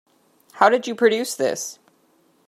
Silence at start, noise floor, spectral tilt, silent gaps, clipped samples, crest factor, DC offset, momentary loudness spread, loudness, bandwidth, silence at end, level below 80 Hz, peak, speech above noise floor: 0.55 s; -61 dBFS; -2.5 dB/octave; none; under 0.1%; 22 dB; under 0.1%; 10 LU; -20 LUFS; 14 kHz; 0.75 s; -78 dBFS; -2 dBFS; 41 dB